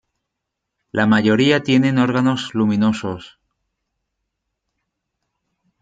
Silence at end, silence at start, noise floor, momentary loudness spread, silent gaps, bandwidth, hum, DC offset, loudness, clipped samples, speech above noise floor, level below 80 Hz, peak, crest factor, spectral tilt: 2.55 s; 0.95 s; -80 dBFS; 11 LU; none; 9.2 kHz; none; under 0.1%; -17 LUFS; under 0.1%; 63 dB; -60 dBFS; -2 dBFS; 18 dB; -6.5 dB/octave